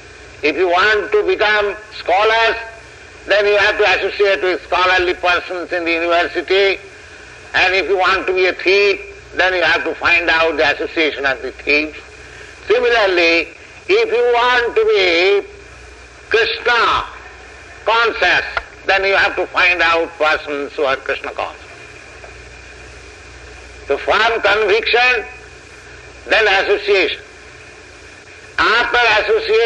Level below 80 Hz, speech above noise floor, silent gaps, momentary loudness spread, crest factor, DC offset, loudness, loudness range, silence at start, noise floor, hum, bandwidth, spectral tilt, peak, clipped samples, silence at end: -44 dBFS; 24 dB; none; 20 LU; 14 dB; under 0.1%; -14 LUFS; 4 LU; 0 s; -38 dBFS; none; 9.8 kHz; -3 dB/octave; -2 dBFS; under 0.1%; 0 s